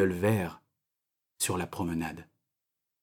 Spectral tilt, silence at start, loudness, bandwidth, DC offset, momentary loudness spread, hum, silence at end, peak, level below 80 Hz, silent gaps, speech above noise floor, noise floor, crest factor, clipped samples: -5 dB/octave; 0 s; -32 LUFS; 19 kHz; under 0.1%; 11 LU; none; 0.8 s; -14 dBFS; -60 dBFS; none; 57 dB; -87 dBFS; 18 dB; under 0.1%